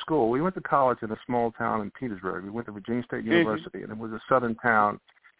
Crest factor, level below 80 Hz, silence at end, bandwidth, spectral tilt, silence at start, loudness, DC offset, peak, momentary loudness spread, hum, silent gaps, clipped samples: 20 dB; -60 dBFS; 0.4 s; 4 kHz; -10 dB/octave; 0 s; -27 LUFS; under 0.1%; -8 dBFS; 13 LU; none; none; under 0.1%